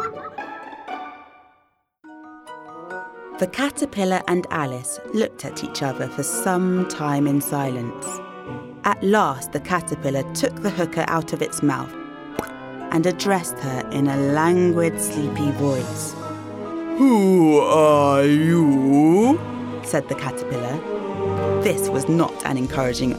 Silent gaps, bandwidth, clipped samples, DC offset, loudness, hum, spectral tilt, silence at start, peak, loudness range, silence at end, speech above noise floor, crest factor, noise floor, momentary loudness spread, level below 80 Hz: none; 16.5 kHz; under 0.1%; under 0.1%; -21 LUFS; none; -5.5 dB/octave; 0 s; -4 dBFS; 9 LU; 0 s; 44 dB; 18 dB; -64 dBFS; 18 LU; -54 dBFS